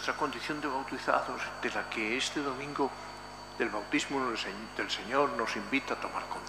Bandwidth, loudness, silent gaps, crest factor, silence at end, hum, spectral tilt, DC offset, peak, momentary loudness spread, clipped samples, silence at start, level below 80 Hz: 15.5 kHz; -33 LUFS; none; 22 dB; 0 s; 50 Hz at -55 dBFS; -3 dB/octave; under 0.1%; -12 dBFS; 6 LU; under 0.1%; 0 s; -58 dBFS